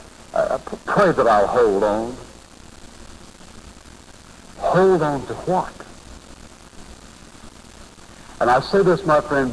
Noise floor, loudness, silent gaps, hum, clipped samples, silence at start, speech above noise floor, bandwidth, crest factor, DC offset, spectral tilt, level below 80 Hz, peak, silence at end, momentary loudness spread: -43 dBFS; -19 LUFS; none; none; under 0.1%; 0 s; 26 dB; 11 kHz; 16 dB; 0.1%; -6 dB/octave; -44 dBFS; -6 dBFS; 0 s; 17 LU